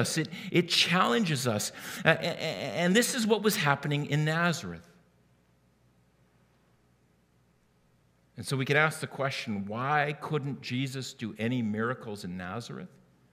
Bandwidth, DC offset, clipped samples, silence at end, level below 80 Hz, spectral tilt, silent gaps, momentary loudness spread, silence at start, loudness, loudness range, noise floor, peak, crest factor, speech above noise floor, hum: 16 kHz; under 0.1%; under 0.1%; 0.45 s; -74 dBFS; -4.5 dB/octave; none; 13 LU; 0 s; -29 LUFS; 8 LU; -67 dBFS; -4 dBFS; 26 dB; 38 dB; none